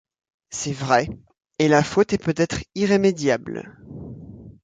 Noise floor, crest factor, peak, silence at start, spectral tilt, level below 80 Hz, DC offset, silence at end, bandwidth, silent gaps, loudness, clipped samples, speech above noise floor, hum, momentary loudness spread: -41 dBFS; 20 dB; -2 dBFS; 0.5 s; -5 dB/octave; -50 dBFS; under 0.1%; 0.15 s; 9.4 kHz; none; -21 LUFS; under 0.1%; 20 dB; none; 21 LU